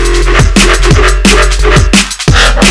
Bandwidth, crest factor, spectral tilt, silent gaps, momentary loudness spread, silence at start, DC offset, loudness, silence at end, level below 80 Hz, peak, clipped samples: 11 kHz; 6 dB; -4 dB/octave; none; 2 LU; 0 s; 1%; -6 LUFS; 0 s; -8 dBFS; 0 dBFS; 2%